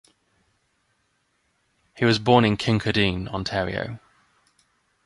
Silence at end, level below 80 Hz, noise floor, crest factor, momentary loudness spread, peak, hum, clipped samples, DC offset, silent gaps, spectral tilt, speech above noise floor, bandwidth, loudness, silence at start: 1.1 s; -48 dBFS; -70 dBFS; 24 dB; 13 LU; -2 dBFS; none; under 0.1%; under 0.1%; none; -6 dB/octave; 48 dB; 11.5 kHz; -22 LUFS; 1.95 s